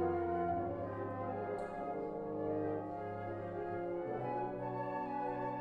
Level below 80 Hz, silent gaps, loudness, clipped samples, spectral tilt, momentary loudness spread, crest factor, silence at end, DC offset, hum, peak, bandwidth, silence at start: -64 dBFS; none; -40 LUFS; under 0.1%; -9.5 dB/octave; 6 LU; 14 dB; 0 s; under 0.1%; none; -26 dBFS; 8.6 kHz; 0 s